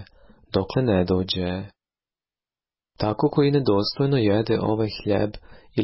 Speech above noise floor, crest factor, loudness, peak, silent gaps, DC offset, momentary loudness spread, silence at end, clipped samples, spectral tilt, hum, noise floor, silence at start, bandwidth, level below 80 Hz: over 68 dB; 14 dB; -23 LUFS; -8 dBFS; none; under 0.1%; 9 LU; 0 s; under 0.1%; -11 dB/octave; none; under -90 dBFS; 0 s; 5.8 kHz; -46 dBFS